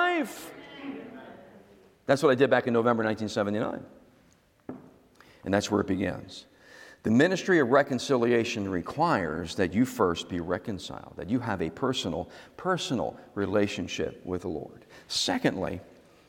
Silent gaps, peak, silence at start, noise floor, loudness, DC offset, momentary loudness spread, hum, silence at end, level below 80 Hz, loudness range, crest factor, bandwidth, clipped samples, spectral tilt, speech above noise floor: none; -8 dBFS; 0 s; -62 dBFS; -28 LUFS; under 0.1%; 19 LU; none; 0.45 s; -62 dBFS; 6 LU; 22 dB; 17 kHz; under 0.1%; -5 dB/octave; 35 dB